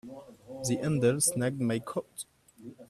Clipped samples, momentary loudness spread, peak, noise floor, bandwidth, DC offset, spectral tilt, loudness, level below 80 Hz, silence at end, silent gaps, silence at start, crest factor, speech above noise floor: under 0.1%; 23 LU; -12 dBFS; -50 dBFS; 15.5 kHz; under 0.1%; -5 dB/octave; -29 LUFS; -66 dBFS; 0.05 s; none; 0.05 s; 20 dB; 21 dB